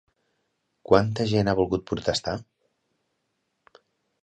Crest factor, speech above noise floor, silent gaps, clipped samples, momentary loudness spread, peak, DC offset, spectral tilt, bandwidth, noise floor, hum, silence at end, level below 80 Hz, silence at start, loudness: 24 dB; 53 dB; none; under 0.1%; 9 LU; -4 dBFS; under 0.1%; -6 dB/octave; 9.2 kHz; -76 dBFS; none; 1.8 s; -50 dBFS; 0.9 s; -24 LUFS